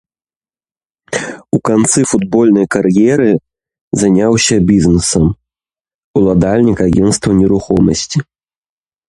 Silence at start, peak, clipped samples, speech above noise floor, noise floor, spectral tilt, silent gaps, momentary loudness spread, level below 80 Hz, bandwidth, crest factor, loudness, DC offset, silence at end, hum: 1.1 s; 0 dBFS; under 0.1%; over 80 dB; under -90 dBFS; -5.5 dB/octave; 3.81-3.91 s, 5.95-6.14 s; 9 LU; -34 dBFS; 11.5 kHz; 12 dB; -12 LUFS; under 0.1%; 0.85 s; none